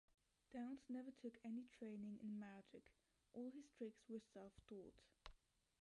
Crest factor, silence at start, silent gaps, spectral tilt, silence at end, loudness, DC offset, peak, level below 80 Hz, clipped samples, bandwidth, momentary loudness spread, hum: 18 dB; 0.1 s; none; -7 dB/octave; 0.45 s; -56 LUFS; under 0.1%; -38 dBFS; -80 dBFS; under 0.1%; 11 kHz; 14 LU; none